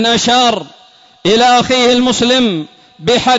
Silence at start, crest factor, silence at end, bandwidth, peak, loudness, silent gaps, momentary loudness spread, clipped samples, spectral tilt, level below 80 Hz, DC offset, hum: 0 s; 10 dB; 0 s; 8 kHz; -2 dBFS; -11 LUFS; none; 12 LU; under 0.1%; -3 dB/octave; -46 dBFS; under 0.1%; none